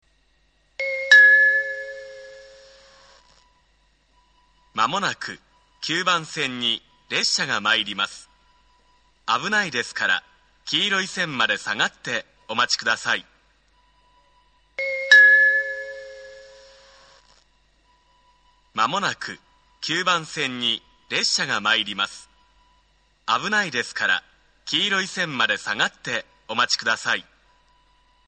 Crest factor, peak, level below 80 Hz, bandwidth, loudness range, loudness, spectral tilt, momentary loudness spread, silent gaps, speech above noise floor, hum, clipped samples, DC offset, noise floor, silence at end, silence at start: 24 dB; 0 dBFS; -64 dBFS; 9.4 kHz; 12 LU; -20 LUFS; -1.5 dB/octave; 18 LU; none; 39 dB; none; under 0.1%; under 0.1%; -63 dBFS; 1.05 s; 0.8 s